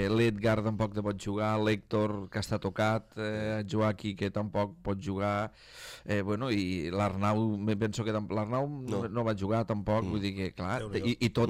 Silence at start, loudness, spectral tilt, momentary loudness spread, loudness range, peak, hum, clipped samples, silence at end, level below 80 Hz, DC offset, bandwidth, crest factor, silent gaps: 0 s; -32 LUFS; -6.5 dB/octave; 5 LU; 2 LU; -14 dBFS; none; under 0.1%; 0 s; -54 dBFS; under 0.1%; 14.5 kHz; 18 dB; none